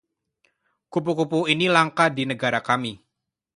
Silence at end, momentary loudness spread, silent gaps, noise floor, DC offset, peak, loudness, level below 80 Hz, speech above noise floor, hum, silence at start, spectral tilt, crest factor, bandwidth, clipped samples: 0.6 s; 9 LU; none; -80 dBFS; under 0.1%; -2 dBFS; -22 LUFS; -66 dBFS; 58 dB; none; 0.9 s; -5 dB/octave; 22 dB; 11.5 kHz; under 0.1%